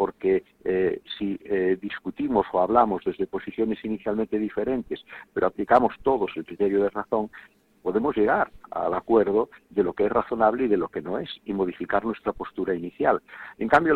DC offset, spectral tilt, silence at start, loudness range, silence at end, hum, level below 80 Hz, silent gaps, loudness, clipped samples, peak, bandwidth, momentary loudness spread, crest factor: under 0.1%; -8 dB/octave; 0 s; 2 LU; 0 s; none; -54 dBFS; none; -25 LUFS; under 0.1%; -4 dBFS; 7.2 kHz; 10 LU; 20 dB